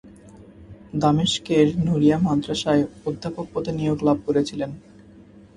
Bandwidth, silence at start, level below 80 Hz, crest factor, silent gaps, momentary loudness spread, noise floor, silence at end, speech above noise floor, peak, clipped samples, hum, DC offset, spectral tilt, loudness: 11 kHz; 0.05 s; -50 dBFS; 18 dB; none; 11 LU; -47 dBFS; 0.75 s; 26 dB; -4 dBFS; under 0.1%; none; under 0.1%; -6 dB/octave; -22 LUFS